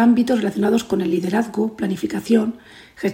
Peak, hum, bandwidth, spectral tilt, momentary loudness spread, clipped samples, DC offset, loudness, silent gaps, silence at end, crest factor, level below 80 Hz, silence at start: -4 dBFS; none; 16 kHz; -6.5 dB/octave; 8 LU; under 0.1%; under 0.1%; -20 LUFS; none; 0 s; 14 dB; -56 dBFS; 0 s